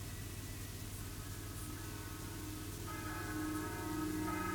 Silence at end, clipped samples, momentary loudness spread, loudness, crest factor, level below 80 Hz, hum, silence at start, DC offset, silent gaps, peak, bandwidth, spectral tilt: 0 s; under 0.1%; 7 LU; -43 LUFS; 14 dB; -54 dBFS; none; 0 s; under 0.1%; none; -28 dBFS; 19.5 kHz; -4.5 dB/octave